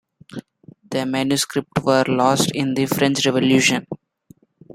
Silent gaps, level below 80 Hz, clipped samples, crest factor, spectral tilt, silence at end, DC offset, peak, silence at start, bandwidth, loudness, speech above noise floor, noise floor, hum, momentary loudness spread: none; -58 dBFS; under 0.1%; 18 dB; -4 dB/octave; 0.8 s; under 0.1%; -2 dBFS; 0.3 s; 16.5 kHz; -19 LUFS; 34 dB; -52 dBFS; none; 20 LU